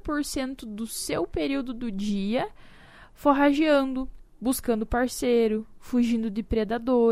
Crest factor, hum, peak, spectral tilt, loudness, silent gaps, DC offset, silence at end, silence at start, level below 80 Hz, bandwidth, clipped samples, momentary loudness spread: 18 dB; none; -6 dBFS; -5 dB/octave; -26 LUFS; none; under 0.1%; 0 s; 0.05 s; -44 dBFS; 15.5 kHz; under 0.1%; 11 LU